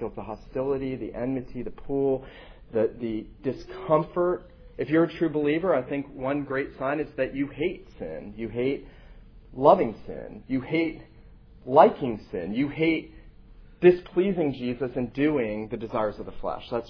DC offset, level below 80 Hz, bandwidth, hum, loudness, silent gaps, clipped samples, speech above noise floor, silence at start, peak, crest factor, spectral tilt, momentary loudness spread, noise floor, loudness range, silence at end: under 0.1%; -50 dBFS; 5.4 kHz; none; -26 LUFS; none; under 0.1%; 24 dB; 0 s; -2 dBFS; 24 dB; -9 dB/octave; 16 LU; -50 dBFS; 6 LU; 0 s